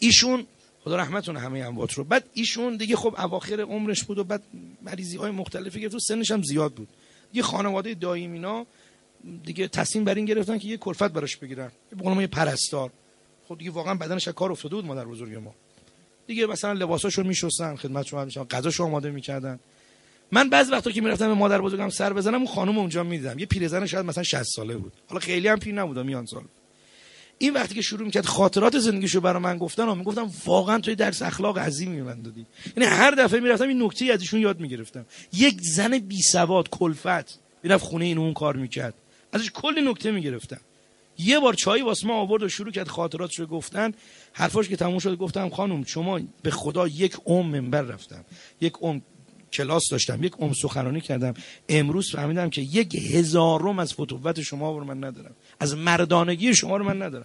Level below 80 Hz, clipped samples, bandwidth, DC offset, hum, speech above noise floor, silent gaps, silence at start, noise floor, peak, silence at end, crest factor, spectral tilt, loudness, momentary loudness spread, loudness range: -56 dBFS; under 0.1%; 11.5 kHz; under 0.1%; none; 34 dB; none; 0 s; -59 dBFS; -2 dBFS; 0 s; 24 dB; -4 dB/octave; -24 LUFS; 15 LU; 7 LU